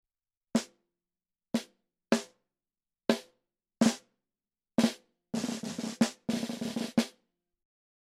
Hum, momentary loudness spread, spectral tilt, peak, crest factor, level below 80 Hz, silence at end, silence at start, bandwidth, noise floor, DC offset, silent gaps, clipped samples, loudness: none; 10 LU; -4.5 dB/octave; -8 dBFS; 28 dB; -74 dBFS; 0.95 s; 0.55 s; 15.5 kHz; under -90 dBFS; under 0.1%; none; under 0.1%; -33 LUFS